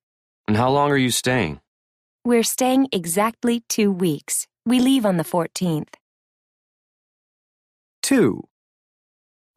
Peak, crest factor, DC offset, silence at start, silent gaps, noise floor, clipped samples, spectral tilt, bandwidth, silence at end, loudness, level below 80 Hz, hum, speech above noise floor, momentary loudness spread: -6 dBFS; 16 dB; under 0.1%; 0.5 s; 1.67-2.19 s, 6.01-8.02 s; under -90 dBFS; under 0.1%; -4.5 dB/octave; 15.5 kHz; 1.15 s; -20 LUFS; -56 dBFS; none; over 70 dB; 10 LU